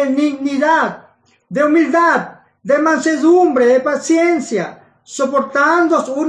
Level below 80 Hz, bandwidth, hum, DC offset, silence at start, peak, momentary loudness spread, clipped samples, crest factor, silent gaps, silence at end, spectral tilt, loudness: -70 dBFS; 10 kHz; none; under 0.1%; 0 s; -4 dBFS; 10 LU; under 0.1%; 12 dB; none; 0 s; -4.5 dB/octave; -14 LUFS